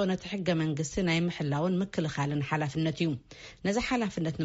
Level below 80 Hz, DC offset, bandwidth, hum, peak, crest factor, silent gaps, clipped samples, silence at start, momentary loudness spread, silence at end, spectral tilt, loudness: -54 dBFS; under 0.1%; 8 kHz; none; -16 dBFS; 14 dB; none; under 0.1%; 0 s; 4 LU; 0 s; -5.5 dB/octave; -30 LUFS